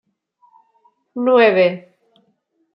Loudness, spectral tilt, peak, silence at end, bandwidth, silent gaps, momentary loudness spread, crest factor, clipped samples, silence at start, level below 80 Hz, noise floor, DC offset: -15 LUFS; -8 dB/octave; -2 dBFS; 0.95 s; 5.6 kHz; none; 21 LU; 18 dB; under 0.1%; 1.15 s; -74 dBFS; -65 dBFS; under 0.1%